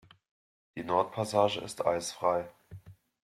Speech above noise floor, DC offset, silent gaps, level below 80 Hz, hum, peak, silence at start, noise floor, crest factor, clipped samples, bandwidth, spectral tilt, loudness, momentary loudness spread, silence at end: 21 dB; under 0.1%; none; -68 dBFS; none; -12 dBFS; 0.75 s; -51 dBFS; 20 dB; under 0.1%; 15 kHz; -4.5 dB/octave; -30 LUFS; 19 LU; 0.35 s